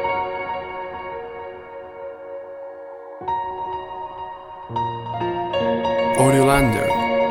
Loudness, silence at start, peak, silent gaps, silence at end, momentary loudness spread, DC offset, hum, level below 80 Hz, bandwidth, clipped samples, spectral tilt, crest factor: -22 LUFS; 0 s; -2 dBFS; none; 0 s; 19 LU; under 0.1%; none; -42 dBFS; 16.5 kHz; under 0.1%; -5.5 dB/octave; 20 dB